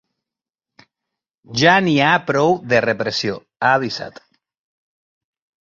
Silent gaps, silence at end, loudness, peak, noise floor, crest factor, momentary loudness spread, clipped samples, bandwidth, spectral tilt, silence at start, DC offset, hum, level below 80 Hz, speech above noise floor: none; 1.5 s; -17 LUFS; -2 dBFS; -87 dBFS; 18 dB; 12 LU; under 0.1%; 7.6 kHz; -5 dB/octave; 1.5 s; under 0.1%; none; -58 dBFS; 70 dB